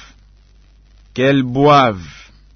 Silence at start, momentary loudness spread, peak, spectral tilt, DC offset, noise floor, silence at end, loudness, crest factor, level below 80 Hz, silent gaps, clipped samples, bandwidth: 1.15 s; 18 LU; -2 dBFS; -6.5 dB/octave; under 0.1%; -47 dBFS; 0.45 s; -13 LUFS; 16 dB; -46 dBFS; none; under 0.1%; 6.6 kHz